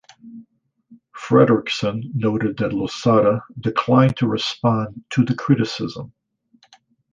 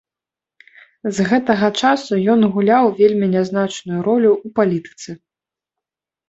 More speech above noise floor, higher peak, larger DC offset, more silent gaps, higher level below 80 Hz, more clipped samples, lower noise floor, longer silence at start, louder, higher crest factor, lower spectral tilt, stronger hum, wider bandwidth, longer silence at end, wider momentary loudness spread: second, 40 dB vs 72 dB; about the same, -2 dBFS vs -2 dBFS; neither; neither; first, -54 dBFS vs -60 dBFS; neither; second, -59 dBFS vs -88 dBFS; second, 0.25 s vs 1.05 s; second, -19 LUFS vs -16 LUFS; about the same, 18 dB vs 16 dB; about the same, -7 dB/octave vs -6 dB/octave; neither; first, 9 kHz vs 8 kHz; about the same, 1.05 s vs 1.15 s; about the same, 9 LU vs 11 LU